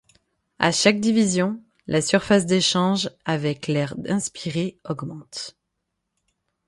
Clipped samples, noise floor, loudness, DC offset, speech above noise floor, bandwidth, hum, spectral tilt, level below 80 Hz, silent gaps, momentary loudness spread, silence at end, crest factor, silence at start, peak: under 0.1%; -78 dBFS; -22 LUFS; under 0.1%; 56 dB; 11.5 kHz; none; -4.5 dB/octave; -58 dBFS; none; 15 LU; 1.15 s; 22 dB; 0.6 s; 0 dBFS